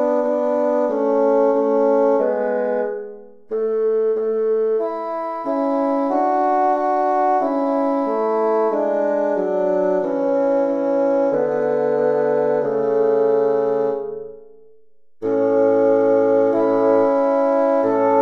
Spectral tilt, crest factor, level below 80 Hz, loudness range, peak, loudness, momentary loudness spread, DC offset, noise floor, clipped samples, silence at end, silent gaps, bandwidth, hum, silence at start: -8 dB/octave; 14 dB; -64 dBFS; 3 LU; -4 dBFS; -18 LUFS; 7 LU; under 0.1%; -59 dBFS; under 0.1%; 0 s; none; 6.4 kHz; none; 0 s